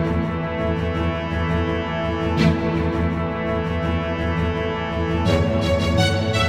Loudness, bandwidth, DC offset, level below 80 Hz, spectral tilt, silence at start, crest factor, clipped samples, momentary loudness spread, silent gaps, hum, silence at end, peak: -22 LUFS; 12 kHz; under 0.1%; -36 dBFS; -6.5 dB/octave; 0 s; 16 dB; under 0.1%; 5 LU; none; none; 0 s; -4 dBFS